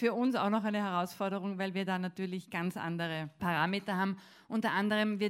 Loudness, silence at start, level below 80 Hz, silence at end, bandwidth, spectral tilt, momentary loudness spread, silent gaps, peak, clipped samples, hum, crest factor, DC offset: -34 LUFS; 0 s; -74 dBFS; 0 s; 16 kHz; -6.5 dB/octave; 7 LU; none; -16 dBFS; under 0.1%; none; 18 dB; under 0.1%